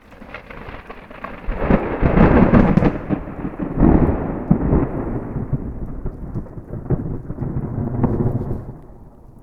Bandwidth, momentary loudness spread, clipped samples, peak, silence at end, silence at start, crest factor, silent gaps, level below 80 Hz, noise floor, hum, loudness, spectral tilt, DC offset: 5.4 kHz; 21 LU; under 0.1%; 0 dBFS; 0.1 s; 0.1 s; 18 dB; none; -26 dBFS; -41 dBFS; none; -19 LUFS; -10.5 dB/octave; under 0.1%